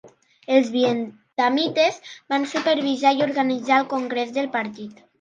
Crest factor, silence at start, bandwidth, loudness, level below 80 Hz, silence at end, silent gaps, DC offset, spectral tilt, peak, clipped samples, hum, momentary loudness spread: 20 dB; 0.05 s; 9.2 kHz; -22 LUFS; -76 dBFS; 0.3 s; none; under 0.1%; -4 dB/octave; -2 dBFS; under 0.1%; none; 11 LU